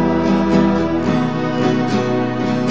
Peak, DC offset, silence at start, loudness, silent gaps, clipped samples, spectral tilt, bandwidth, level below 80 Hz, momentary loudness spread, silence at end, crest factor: -2 dBFS; 2%; 0 s; -17 LUFS; none; under 0.1%; -7.5 dB/octave; 8 kHz; -40 dBFS; 4 LU; 0 s; 14 dB